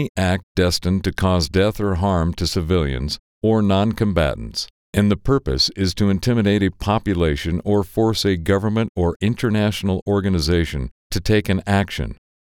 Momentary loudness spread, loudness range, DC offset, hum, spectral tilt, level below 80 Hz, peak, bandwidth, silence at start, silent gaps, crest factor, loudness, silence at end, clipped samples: 7 LU; 1 LU; under 0.1%; none; -6 dB/octave; -32 dBFS; -2 dBFS; 17.5 kHz; 0 s; 0.09-0.15 s, 0.43-0.55 s, 3.19-3.41 s, 4.70-4.93 s, 8.89-8.95 s, 9.16-9.20 s, 10.02-10.06 s, 10.91-11.10 s; 18 dB; -20 LUFS; 0.35 s; under 0.1%